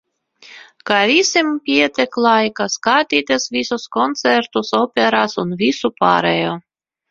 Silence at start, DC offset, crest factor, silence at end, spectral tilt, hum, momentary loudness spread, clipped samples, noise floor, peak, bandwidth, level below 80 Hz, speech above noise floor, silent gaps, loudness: 0.5 s; under 0.1%; 18 dB; 0.5 s; -3.5 dB/octave; none; 7 LU; under 0.1%; -46 dBFS; 0 dBFS; 7.6 kHz; -60 dBFS; 30 dB; none; -16 LUFS